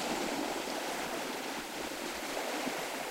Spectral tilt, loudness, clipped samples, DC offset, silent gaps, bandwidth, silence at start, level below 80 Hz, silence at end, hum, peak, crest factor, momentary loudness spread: -2 dB/octave; -36 LUFS; under 0.1%; under 0.1%; none; 16 kHz; 0 s; -64 dBFS; 0 s; none; -20 dBFS; 16 dB; 4 LU